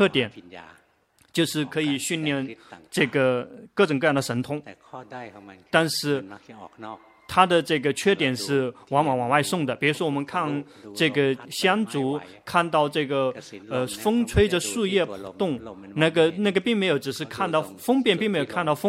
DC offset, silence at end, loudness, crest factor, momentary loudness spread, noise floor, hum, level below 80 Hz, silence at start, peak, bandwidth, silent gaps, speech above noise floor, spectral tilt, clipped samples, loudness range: under 0.1%; 0 s; -24 LUFS; 22 dB; 17 LU; -62 dBFS; none; -50 dBFS; 0 s; -2 dBFS; 16 kHz; none; 38 dB; -4.5 dB/octave; under 0.1%; 3 LU